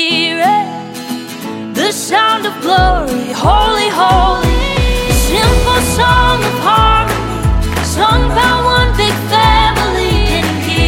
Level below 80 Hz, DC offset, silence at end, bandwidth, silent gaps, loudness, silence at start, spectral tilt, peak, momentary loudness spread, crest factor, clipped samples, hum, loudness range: -18 dBFS; under 0.1%; 0 s; 17 kHz; none; -11 LUFS; 0 s; -4 dB/octave; 0 dBFS; 6 LU; 12 dB; under 0.1%; none; 2 LU